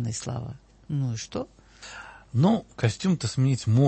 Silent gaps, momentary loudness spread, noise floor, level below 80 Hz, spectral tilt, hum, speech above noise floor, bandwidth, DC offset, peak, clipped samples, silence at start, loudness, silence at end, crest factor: none; 19 LU; -44 dBFS; -54 dBFS; -6.5 dB/octave; none; 19 dB; 8.8 kHz; under 0.1%; -8 dBFS; under 0.1%; 0 s; -27 LUFS; 0 s; 18 dB